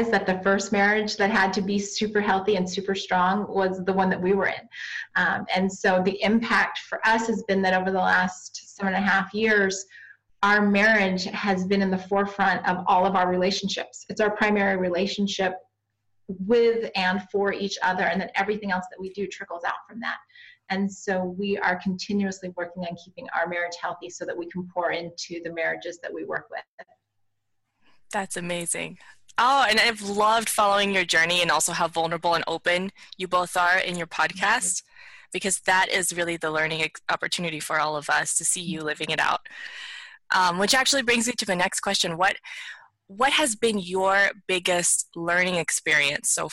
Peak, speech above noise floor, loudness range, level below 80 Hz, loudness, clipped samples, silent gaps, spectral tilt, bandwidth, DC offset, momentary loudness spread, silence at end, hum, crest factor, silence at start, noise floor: -10 dBFS; 53 dB; 8 LU; -60 dBFS; -24 LUFS; under 0.1%; 26.68-26.78 s; -3 dB/octave; 16 kHz; under 0.1%; 13 LU; 0 s; none; 14 dB; 0 s; -77 dBFS